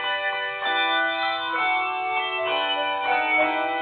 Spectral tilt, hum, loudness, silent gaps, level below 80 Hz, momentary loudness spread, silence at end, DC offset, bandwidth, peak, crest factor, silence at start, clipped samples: -5.5 dB/octave; none; -23 LUFS; none; -70 dBFS; 4 LU; 0 s; under 0.1%; 4.7 kHz; -10 dBFS; 14 dB; 0 s; under 0.1%